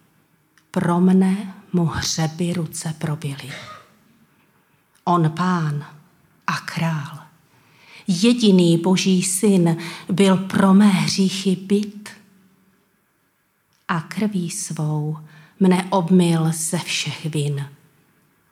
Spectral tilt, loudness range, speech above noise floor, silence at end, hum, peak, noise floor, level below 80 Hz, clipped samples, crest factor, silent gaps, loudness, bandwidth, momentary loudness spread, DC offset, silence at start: -5.5 dB/octave; 9 LU; 47 dB; 0.8 s; none; -2 dBFS; -65 dBFS; -58 dBFS; under 0.1%; 18 dB; none; -20 LUFS; 15 kHz; 14 LU; under 0.1%; 0.75 s